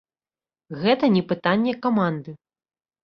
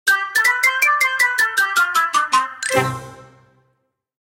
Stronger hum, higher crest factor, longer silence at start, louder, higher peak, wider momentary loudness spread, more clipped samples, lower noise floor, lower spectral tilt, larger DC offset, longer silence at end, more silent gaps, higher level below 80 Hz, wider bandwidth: neither; about the same, 18 dB vs 16 dB; first, 0.7 s vs 0.05 s; second, -22 LUFS vs -16 LUFS; second, -6 dBFS vs -2 dBFS; first, 15 LU vs 5 LU; neither; first, under -90 dBFS vs -69 dBFS; first, -8.5 dB/octave vs -1.5 dB/octave; neither; second, 0.7 s vs 1 s; neither; about the same, -64 dBFS vs -60 dBFS; second, 6 kHz vs 17 kHz